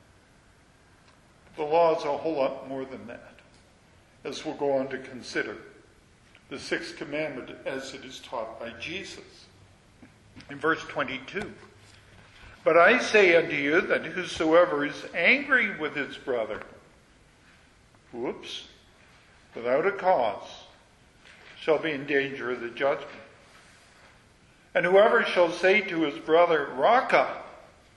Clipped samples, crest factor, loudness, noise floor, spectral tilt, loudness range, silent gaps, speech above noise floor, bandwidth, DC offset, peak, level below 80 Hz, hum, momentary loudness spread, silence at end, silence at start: under 0.1%; 22 dB; -25 LUFS; -58 dBFS; -4.5 dB/octave; 13 LU; none; 33 dB; 11.5 kHz; under 0.1%; -6 dBFS; -64 dBFS; none; 21 LU; 0.4 s; 1.55 s